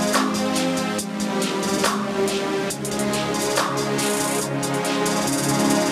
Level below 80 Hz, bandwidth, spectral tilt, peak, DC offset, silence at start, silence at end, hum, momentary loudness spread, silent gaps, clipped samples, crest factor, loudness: -56 dBFS; 16 kHz; -3.5 dB/octave; -6 dBFS; under 0.1%; 0 s; 0 s; none; 4 LU; none; under 0.1%; 16 dB; -22 LUFS